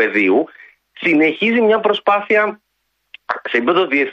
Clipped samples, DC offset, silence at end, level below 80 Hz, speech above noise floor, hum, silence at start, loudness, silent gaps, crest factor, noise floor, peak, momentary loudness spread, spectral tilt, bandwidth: under 0.1%; under 0.1%; 0 s; -66 dBFS; 54 dB; none; 0 s; -15 LUFS; none; 14 dB; -70 dBFS; -2 dBFS; 8 LU; -6 dB/octave; 7 kHz